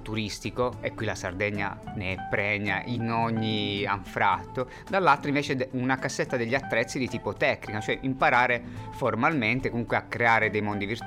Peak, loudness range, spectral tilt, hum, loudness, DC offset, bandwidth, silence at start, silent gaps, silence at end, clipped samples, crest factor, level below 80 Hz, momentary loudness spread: -8 dBFS; 3 LU; -5.5 dB/octave; none; -27 LUFS; under 0.1%; 15.5 kHz; 0 s; none; 0 s; under 0.1%; 18 dB; -52 dBFS; 9 LU